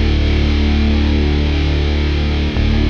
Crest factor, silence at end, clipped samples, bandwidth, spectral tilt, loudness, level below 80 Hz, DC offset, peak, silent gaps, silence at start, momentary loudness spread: 10 dB; 0 s; under 0.1%; 6.6 kHz; -7 dB/octave; -16 LUFS; -16 dBFS; under 0.1%; -2 dBFS; none; 0 s; 2 LU